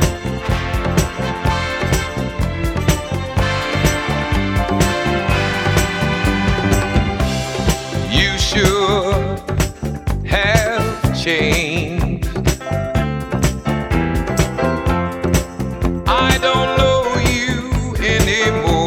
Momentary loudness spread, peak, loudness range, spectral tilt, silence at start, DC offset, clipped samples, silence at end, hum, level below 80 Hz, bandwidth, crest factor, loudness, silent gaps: 6 LU; 0 dBFS; 3 LU; -5 dB/octave; 0 s; under 0.1%; under 0.1%; 0 s; none; -24 dBFS; 18 kHz; 16 dB; -17 LUFS; none